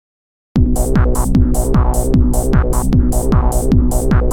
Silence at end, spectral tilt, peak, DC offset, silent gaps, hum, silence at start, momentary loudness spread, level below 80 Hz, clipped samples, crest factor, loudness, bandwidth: 0 s; -7 dB/octave; 0 dBFS; under 0.1%; none; none; 0.55 s; 1 LU; -14 dBFS; under 0.1%; 12 dB; -15 LUFS; 17.5 kHz